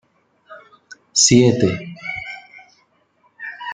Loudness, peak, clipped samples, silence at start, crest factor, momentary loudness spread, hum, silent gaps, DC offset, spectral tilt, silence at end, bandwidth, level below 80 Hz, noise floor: -16 LUFS; -2 dBFS; under 0.1%; 0.5 s; 20 dB; 22 LU; none; none; under 0.1%; -3.5 dB/octave; 0 s; 10 kHz; -52 dBFS; -61 dBFS